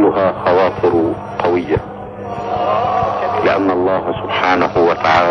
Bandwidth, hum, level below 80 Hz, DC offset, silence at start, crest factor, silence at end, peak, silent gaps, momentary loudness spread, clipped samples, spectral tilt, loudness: 9.4 kHz; none; -44 dBFS; under 0.1%; 0 s; 14 dB; 0 s; 0 dBFS; none; 7 LU; under 0.1%; -7 dB/octave; -15 LUFS